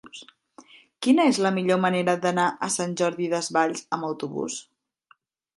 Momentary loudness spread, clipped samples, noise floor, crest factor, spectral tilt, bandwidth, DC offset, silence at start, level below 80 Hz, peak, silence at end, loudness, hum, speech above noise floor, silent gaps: 11 LU; under 0.1%; -62 dBFS; 18 dB; -4.5 dB/octave; 11.5 kHz; under 0.1%; 0.05 s; -74 dBFS; -8 dBFS; 0.95 s; -24 LUFS; none; 39 dB; none